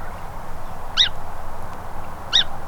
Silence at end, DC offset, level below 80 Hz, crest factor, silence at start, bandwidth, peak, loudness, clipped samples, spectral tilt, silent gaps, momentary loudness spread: 0 s; under 0.1%; -32 dBFS; 18 dB; 0 s; 13 kHz; -4 dBFS; -19 LUFS; under 0.1%; -1.5 dB/octave; none; 17 LU